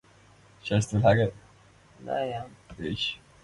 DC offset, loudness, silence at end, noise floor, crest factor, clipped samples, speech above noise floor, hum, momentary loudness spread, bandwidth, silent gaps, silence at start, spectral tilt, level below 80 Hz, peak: under 0.1%; -28 LUFS; 0.25 s; -57 dBFS; 22 dB; under 0.1%; 30 dB; none; 17 LU; 11 kHz; none; 0.65 s; -6 dB/octave; -52 dBFS; -8 dBFS